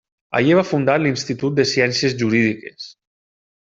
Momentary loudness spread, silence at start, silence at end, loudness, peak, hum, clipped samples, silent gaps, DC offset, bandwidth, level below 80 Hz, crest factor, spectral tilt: 15 LU; 0.3 s; 0.7 s; -18 LUFS; -2 dBFS; none; under 0.1%; none; under 0.1%; 7.8 kHz; -58 dBFS; 16 dB; -5 dB/octave